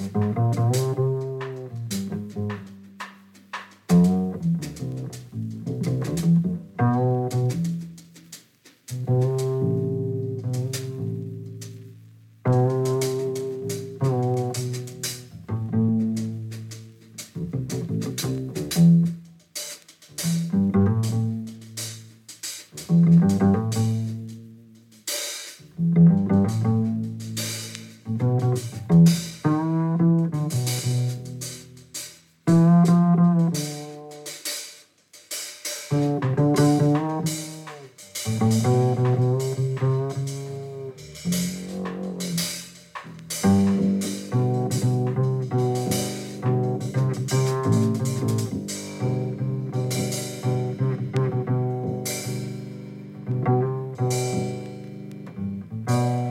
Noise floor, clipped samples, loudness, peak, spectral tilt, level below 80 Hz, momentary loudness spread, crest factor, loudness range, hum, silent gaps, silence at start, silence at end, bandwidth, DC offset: -55 dBFS; under 0.1%; -24 LUFS; -8 dBFS; -6.5 dB/octave; -58 dBFS; 18 LU; 16 dB; 6 LU; none; none; 0 s; 0 s; 16.5 kHz; under 0.1%